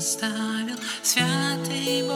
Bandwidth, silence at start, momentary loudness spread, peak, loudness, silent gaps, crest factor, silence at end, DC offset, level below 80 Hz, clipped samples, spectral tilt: 17 kHz; 0 s; 7 LU; -6 dBFS; -24 LUFS; none; 20 dB; 0 s; under 0.1%; -78 dBFS; under 0.1%; -3 dB/octave